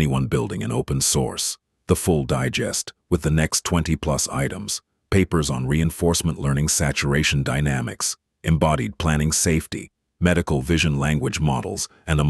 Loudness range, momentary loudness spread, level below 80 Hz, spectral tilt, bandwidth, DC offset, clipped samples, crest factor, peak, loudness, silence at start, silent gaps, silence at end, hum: 1 LU; 6 LU; -34 dBFS; -4.5 dB/octave; 12.5 kHz; under 0.1%; under 0.1%; 18 dB; -2 dBFS; -22 LUFS; 0 s; none; 0 s; none